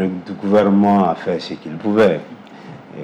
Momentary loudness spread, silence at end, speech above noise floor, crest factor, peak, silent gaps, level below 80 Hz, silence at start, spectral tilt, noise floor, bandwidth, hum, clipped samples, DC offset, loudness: 23 LU; 0 s; 21 dB; 12 dB; -4 dBFS; none; -58 dBFS; 0 s; -8 dB/octave; -37 dBFS; 8.2 kHz; none; under 0.1%; under 0.1%; -17 LUFS